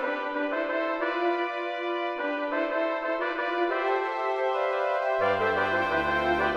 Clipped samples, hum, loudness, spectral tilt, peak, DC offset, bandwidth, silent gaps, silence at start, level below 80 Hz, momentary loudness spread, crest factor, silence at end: under 0.1%; none; -27 LUFS; -5.5 dB/octave; -14 dBFS; under 0.1%; 8.8 kHz; none; 0 s; -56 dBFS; 5 LU; 14 dB; 0 s